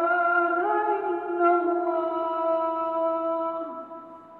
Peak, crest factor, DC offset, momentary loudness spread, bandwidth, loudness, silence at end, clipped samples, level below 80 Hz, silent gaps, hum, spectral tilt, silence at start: -10 dBFS; 14 dB; under 0.1%; 12 LU; 4.2 kHz; -25 LUFS; 0 s; under 0.1%; -78 dBFS; none; none; -7.5 dB/octave; 0 s